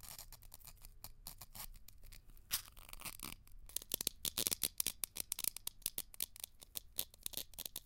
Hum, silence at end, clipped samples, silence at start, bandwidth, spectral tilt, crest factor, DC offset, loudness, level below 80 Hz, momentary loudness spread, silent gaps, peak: none; 0 s; under 0.1%; 0 s; 17 kHz; 0 dB/octave; 36 dB; under 0.1%; -42 LUFS; -60 dBFS; 19 LU; none; -12 dBFS